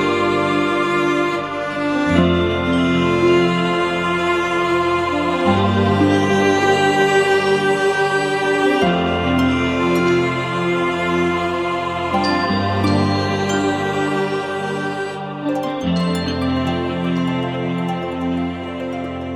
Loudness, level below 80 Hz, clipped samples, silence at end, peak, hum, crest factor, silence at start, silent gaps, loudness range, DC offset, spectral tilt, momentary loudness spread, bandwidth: -18 LUFS; -44 dBFS; under 0.1%; 0 s; -2 dBFS; none; 16 dB; 0 s; none; 5 LU; under 0.1%; -6 dB/octave; 7 LU; 13 kHz